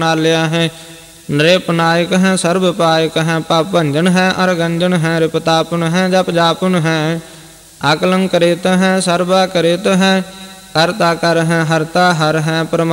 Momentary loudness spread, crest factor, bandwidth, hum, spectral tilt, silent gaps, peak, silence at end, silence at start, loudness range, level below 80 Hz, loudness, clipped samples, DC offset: 5 LU; 14 dB; 16.5 kHz; none; -5 dB/octave; none; 0 dBFS; 0 s; 0 s; 1 LU; -50 dBFS; -13 LUFS; under 0.1%; under 0.1%